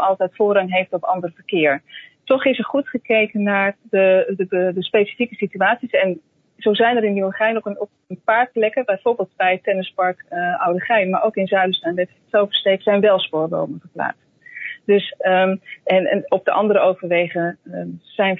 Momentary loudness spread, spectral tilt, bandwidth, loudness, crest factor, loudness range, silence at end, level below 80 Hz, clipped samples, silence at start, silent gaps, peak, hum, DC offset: 10 LU; -8 dB/octave; 4.1 kHz; -19 LUFS; 16 dB; 2 LU; 0 s; -74 dBFS; under 0.1%; 0 s; none; -2 dBFS; none; under 0.1%